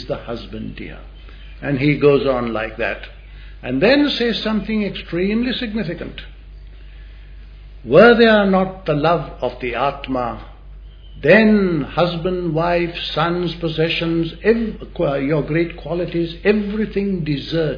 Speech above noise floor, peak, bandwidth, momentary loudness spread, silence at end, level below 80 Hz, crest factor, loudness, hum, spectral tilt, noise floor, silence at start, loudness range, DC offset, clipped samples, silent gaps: 20 dB; 0 dBFS; 5.2 kHz; 17 LU; 0 s; -38 dBFS; 18 dB; -18 LUFS; none; -8 dB/octave; -37 dBFS; 0 s; 5 LU; under 0.1%; under 0.1%; none